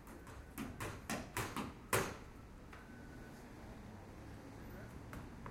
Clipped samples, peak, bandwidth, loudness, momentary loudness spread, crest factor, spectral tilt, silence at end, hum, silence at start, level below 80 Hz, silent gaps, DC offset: under 0.1%; -20 dBFS; 16.5 kHz; -47 LUFS; 16 LU; 28 dB; -4 dB/octave; 0 s; none; 0 s; -58 dBFS; none; under 0.1%